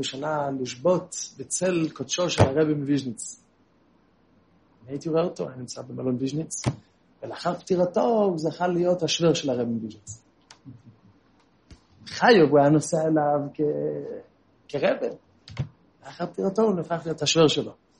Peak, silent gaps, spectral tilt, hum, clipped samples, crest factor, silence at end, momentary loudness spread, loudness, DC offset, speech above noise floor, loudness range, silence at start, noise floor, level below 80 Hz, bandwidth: -2 dBFS; none; -5 dB/octave; none; under 0.1%; 22 dB; 0.25 s; 17 LU; -24 LUFS; under 0.1%; 38 dB; 8 LU; 0 s; -62 dBFS; -58 dBFS; 10.5 kHz